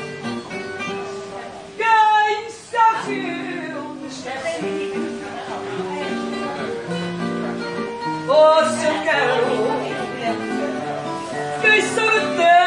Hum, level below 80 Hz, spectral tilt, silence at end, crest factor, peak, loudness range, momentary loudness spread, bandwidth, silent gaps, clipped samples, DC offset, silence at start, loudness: none; -64 dBFS; -4 dB/octave; 0 s; 18 dB; -2 dBFS; 7 LU; 15 LU; 11.5 kHz; none; under 0.1%; under 0.1%; 0 s; -20 LUFS